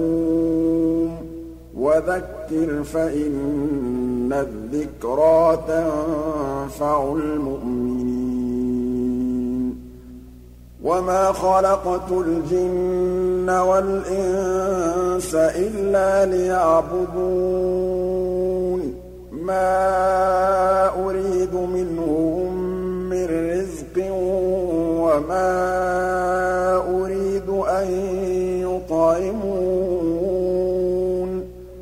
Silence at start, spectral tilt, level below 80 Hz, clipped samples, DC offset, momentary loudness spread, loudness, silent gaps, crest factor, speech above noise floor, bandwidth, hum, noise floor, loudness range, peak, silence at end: 0 s; -7 dB/octave; -40 dBFS; under 0.1%; under 0.1%; 7 LU; -21 LUFS; none; 14 dB; 23 dB; 15.5 kHz; 60 Hz at -40 dBFS; -42 dBFS; 3 LU; -6 dBFS; 0 s